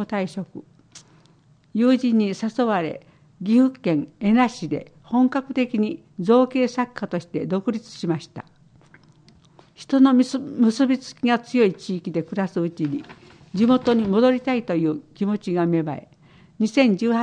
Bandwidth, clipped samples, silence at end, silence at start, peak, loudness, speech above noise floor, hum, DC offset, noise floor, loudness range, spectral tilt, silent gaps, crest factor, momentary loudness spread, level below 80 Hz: 9.6 kHz; under 0.1%; 0 s; 0 s; -4 dBFS; -22 LUFS; 35 dB; none; under 0.1%; -56 dBFS; 3 LU; -7 dB/octave; none; 18 dB; 12 LU; -62 dBFS